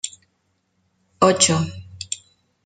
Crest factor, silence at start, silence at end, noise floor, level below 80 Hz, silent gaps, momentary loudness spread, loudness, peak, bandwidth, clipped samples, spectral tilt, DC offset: 22 dB; 0.05 s; 0.5 s; -69 dBFS; -60 dBFS; none; 17 LU; -20 LUFS; -2 dBFS; 9.4 kHz; under 0.1%; -3.5 dB/octave; under 0.1%